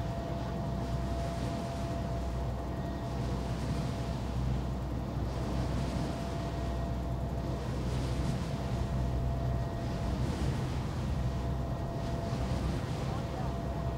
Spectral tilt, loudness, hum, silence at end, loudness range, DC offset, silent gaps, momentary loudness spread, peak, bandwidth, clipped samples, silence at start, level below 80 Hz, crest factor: -7 dB/octave; -35 LUFS; none; 0 s; 2 LU; under 0.1%; none; 3 LU; -20 dBFS; 15.5 kHz; under 0.1%; 0 s; -38 dBFS; 14 dB